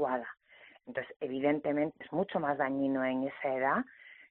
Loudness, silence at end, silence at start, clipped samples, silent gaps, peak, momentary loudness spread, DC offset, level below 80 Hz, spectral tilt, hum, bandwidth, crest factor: -33 LUFS; 0.05 s; 0 s; under 0.1%; 1.16-1.20 s; -16 dBFS; 14 LU; under 0.1%; -76 dBFS; -5 dB/octave; none; 4.2 kHz; 18 dB